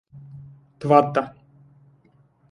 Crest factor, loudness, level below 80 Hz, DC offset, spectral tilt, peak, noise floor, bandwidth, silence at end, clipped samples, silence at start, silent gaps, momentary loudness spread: 24 dB; -20 LUFS; -64 dBFS; under 0.1%; -8 dB/octave; 0 dBFS; -59 dBFS; 11 kHz; 1.25 s; under 0.1%; 0.15 s; none; 27 LU